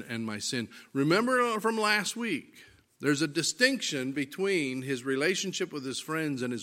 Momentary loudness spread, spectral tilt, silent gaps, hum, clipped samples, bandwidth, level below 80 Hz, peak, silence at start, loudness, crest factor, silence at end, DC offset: 9 LU; -3.5 dB/octave; none; none; under 0.1%; 16.5 kHz; -76 dBFS; -8 dBFS; 0 s; -29 LUFS; 22 dB; 0 s; under 0.1%